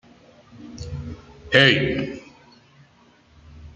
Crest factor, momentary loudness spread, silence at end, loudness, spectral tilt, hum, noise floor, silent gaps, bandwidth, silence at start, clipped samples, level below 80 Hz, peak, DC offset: 24 dB; 25 LU; 0.05 s; -18 LUFS; -5 dB/octave; none; -55 dBFS; none; 8.4 kHz; 0.55 s; under 0.1%; -48 dBFS; -2 dBFS; under 0.1%